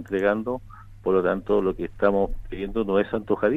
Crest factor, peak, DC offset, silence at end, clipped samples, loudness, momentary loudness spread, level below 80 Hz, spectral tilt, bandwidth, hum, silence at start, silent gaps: 20 dB; -4 dBFS; under 0.1%; 0 s; under 0.1%; -25 LUFS; 9 LU; -40 dBFS; -8.5 dB/octave; 6.6 kHz; none; 0 s; none